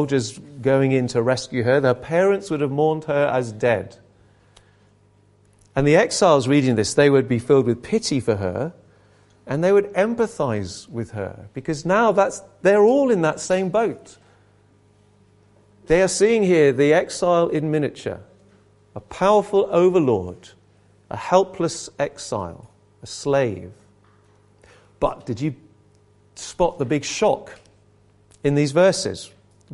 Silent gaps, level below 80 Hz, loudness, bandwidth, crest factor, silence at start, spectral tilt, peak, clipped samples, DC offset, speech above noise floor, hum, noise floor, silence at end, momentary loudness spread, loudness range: none; -50 dBFS; -20 LUFS; 11.5 kHz; 20 dB; 0 s; -5.5 dB/octave; -2 dBFS; under 0.1%; under 0.1%; 37 dB; 50 Hz at -50 dBFS; -56 dBFS; 0 s; 15 LU; 8 LU